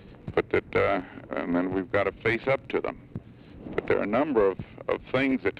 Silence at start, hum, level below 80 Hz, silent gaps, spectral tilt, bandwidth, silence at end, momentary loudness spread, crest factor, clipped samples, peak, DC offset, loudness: 0 s; none; -52 dBFS; none; -8 dB/octave; 7.8 kHz; 0.1 s; 11 LU; 16 dB; under 0.1%; -12 dBFS; under 0.1%; -27 LUFS